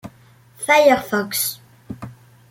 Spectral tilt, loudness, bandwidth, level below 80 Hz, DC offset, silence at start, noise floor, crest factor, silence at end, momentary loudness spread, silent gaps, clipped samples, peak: -3 dB/octave; -17 LUFS; 17 kHz; -58 dBFS; under 0.1%; 0.05 s; -50 dBFS; 20 dB; 0.4 s; 25 LU; none; under 0.1%; -2 dBFS